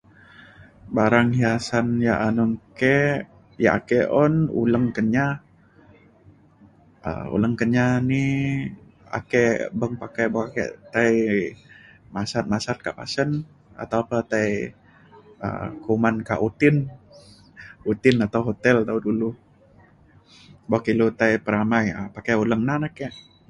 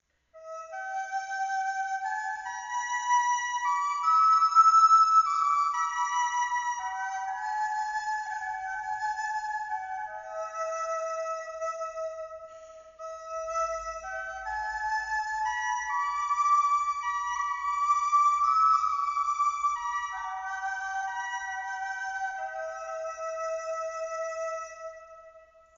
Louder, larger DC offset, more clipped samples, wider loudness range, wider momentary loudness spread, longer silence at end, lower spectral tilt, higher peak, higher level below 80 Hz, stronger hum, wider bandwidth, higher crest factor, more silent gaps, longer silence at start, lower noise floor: first, -22 LUFS vs -28 LUFS; neither; neither; second, 5 LU vs 13 LU; about the same, 12 LU vs 14 LU; about the same, 0.3 s vs 0.4 s; first, -7 dB/octave vs 3.5 dB/octave; first, -2 dBFS vs -10 dBFS; first, -52 dBFS vs -64 dBFS; neither; first, 11 kHz vs 7.6 kHz; about the same, 20 dB vs 18 dB; neither; first, 0.6 s vs 0.35 s; about the same, -53 dBFS vs -55 dBFS